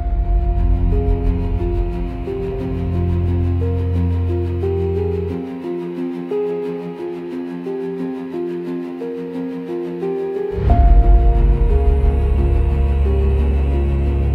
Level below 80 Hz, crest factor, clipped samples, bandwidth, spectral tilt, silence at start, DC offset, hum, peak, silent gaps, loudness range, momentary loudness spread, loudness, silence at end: -18 dBFS; 16 dB; under 0.1%; 4.4 kHz; -10.5 dB/octave; 0 s; under 0.1%; none; -2 dBFS; none; 8 LU; 9 LU; -20 LUFS; 0 s